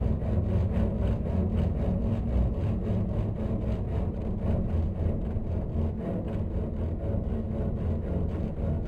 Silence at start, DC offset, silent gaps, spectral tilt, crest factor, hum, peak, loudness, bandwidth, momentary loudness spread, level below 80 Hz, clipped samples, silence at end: 0 s; under 0.1%; none; -10.5 dB/octave; 14 dB; none; -14 dBFS; -30 LUFS; 4.6 kHz; 4 LU; -34 dBFS; under 0.1%; 0 s